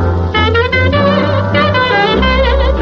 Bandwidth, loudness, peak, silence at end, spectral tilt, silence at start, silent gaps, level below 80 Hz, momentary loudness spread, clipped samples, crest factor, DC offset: 6.8 kHz; -11 LUFS; -2 dBFS; 0 s; -7 dB/octave; 0 s; none; -20 dBFS; 2 LU; under 0.1%; 10 dB; under 0.1%